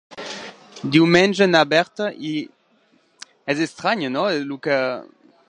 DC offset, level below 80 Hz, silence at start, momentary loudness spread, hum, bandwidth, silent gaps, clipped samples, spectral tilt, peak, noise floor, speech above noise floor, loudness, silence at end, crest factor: under 0.1%; -64 dBFS; 0.1 s; 18 LU; none; 10 kHz; none; under 0.1%; -5 dB/octave; -2 dBFS; -60 dBFS; 41 dB; -19 LUFS; 0.4 s; 20 dB